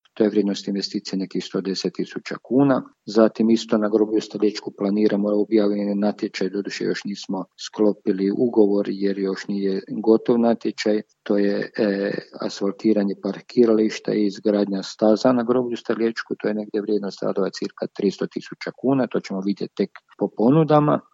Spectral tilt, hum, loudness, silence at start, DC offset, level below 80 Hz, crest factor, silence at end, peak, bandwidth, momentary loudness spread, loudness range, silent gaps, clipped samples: -6.5 dB/octave; none; -22 LUFS; 0.2 s; under 0.1%; -74 dBFS; 20 dB; 0.15 s; -2 dBFS; 7.8 kHz; 10 LU; 4 LU; none; under 0.1%